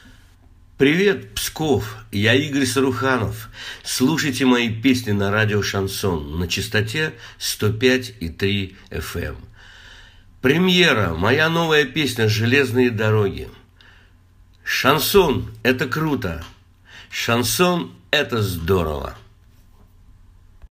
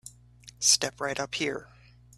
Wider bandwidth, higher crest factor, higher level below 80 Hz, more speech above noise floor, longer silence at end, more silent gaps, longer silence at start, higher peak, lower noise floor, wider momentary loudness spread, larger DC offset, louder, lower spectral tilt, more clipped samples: about the same, 15.5 kHz vs 15.5 kHz; about the same, 20 dB vs 24 dB; first, -44 dBFS vs -62 dBFS; first, 31 dB vs 25 dB; second, 0.05 s vs 0.5 s; neither; first, 0.8 s vs 0.05 s; first, 0 dBFS vs -8 dBFS; about the same, -51 dBFS vs -53 dBFS; first, 13 LU vs 10 LU; neither; first, -19 LUFS vs -26 LUFS; first, -4.5 dB/octave vs -0.5 dB/octave; neither